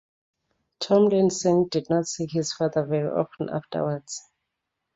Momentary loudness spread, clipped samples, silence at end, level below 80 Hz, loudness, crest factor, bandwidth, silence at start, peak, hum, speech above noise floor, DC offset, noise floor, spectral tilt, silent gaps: 12 LU; under 0.1%; 0.75 s; -66 dBFS; -24 LUFS; 18 dB; 8 kHz; 0.8 s; -8 dBFS; none; 58 dB; under 0.1%; -82 dBFS; -5.5 dB/octave; none